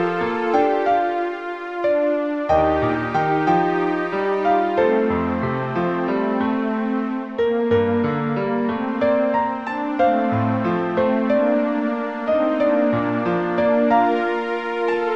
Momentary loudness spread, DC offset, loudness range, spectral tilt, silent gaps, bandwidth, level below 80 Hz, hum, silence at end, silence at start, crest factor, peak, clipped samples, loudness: 5 LU; 0.2%; 2 LU; -8 dB/octave; none; 7.4 kHz; -50 dBFS; none; 0 s; 0 s; 14 dB; -6 dBFS; under 0.1%; -20 LUFS